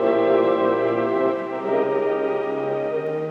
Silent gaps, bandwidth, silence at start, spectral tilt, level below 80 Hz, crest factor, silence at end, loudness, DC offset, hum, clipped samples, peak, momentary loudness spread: none; 6.2 kHz; 0 s; -8 dB/octave; -70 dBFS; 14 dB; 0 s; -22 LUFS; under 0.1%; none; under 0.1%; -8 dBFS; 6 LU